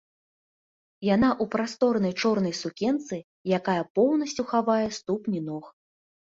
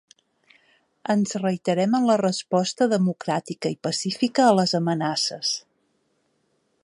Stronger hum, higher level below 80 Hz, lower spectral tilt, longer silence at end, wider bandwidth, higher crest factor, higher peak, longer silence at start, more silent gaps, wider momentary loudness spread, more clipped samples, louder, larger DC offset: neither; first, -60 dBFS vs -72 dBFS; about the same, -5.5 dB/octave vs -5 dB/octave; second, 0.5 s vs 1.25 s; second, 7.8 kHz vs 11.5 kHz; about the same, 18 dB vs 20 dB; second, -10 dBFS vs -4 dBFS; about the same, 1 s vs 1.1 s; first, 3.24-3.45 s, 3.90-3.95 s vs none; about the same, 9 LU vs 9 LU; neither; second, -26 LUFS vs -23 LUFS; neither